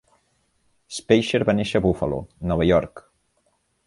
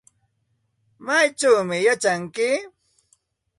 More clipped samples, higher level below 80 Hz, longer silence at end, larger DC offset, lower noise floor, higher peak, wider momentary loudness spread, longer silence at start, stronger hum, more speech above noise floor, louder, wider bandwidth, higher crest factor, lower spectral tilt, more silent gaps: neither; first, -42 dBFS vs -70 dBFS; about the same, 0.9 s vs 0.9 s; neither; about the same, -68 dBFS vs -71 dBFS; about the same, -4 dBFS vs -6 dBFS; first, 14 LU vs 6 LU; about the same, 0.9 s vs 1 s; neither; about the same, 47 dB vs 50 dB; about the same, -21 LUFS vs -20 LUFS; about the same, 11.5 kHz vs 11.5 kHz; about the same, 20 dB vs 18 dB; first, -6 dB/octave vs -3 dB/octave; neither